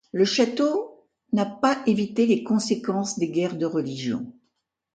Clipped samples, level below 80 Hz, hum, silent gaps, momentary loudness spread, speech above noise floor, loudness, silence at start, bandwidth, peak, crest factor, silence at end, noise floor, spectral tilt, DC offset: under 0.1%; -68 dBFS; none; none; 8 LU; 52 dB; -24 LUFS; 0.15 s; 9.2 kHz; -8 dBFS; 16 dB; 0.65 s; -75 dBFS; -5 dB/octave; under 0.1%